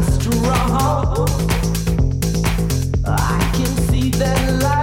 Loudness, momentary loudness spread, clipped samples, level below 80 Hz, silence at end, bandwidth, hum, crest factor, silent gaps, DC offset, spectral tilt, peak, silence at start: -18 LUFS; 2 LU; under 0.1%; -22 dBFS; 0 s; 17 kHz; none; 14 dB; none; under 0.1%; -5.5 dB/octave; -4 dBFS; 0 s